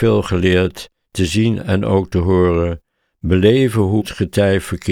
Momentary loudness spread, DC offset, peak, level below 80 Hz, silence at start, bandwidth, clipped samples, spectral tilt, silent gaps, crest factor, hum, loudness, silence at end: 9 LU; under 0.1%; -2 dBFS; -36 dBFS; 0 s; 15.5 kHz; under 0.1%; -6.5 dB/octave; none; 14 dB; none; -16 LUFS; 0 s